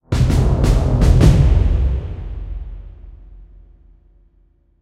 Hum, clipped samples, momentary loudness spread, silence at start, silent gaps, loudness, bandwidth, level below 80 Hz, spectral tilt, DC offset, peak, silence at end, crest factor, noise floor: none; under 0.1%; 20 LU; 0.1 s; none; -15 LUFS; 12 kHz; -18 dBFS; -7.5 dB/octave; under 0.1%; 0 dBFS; 1.35 s; 16 dB; -55 dBFS